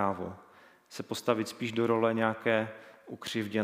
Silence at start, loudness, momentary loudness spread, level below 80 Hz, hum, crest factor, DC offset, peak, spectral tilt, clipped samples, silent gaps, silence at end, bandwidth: 0 s; -31 LUFS; 20 LU; -74 dBFS; none; 22 dB; under 0.1%; -10 dBFS; -5.5 dB/octave; under 0.1%; none; 0 s; 16 kHz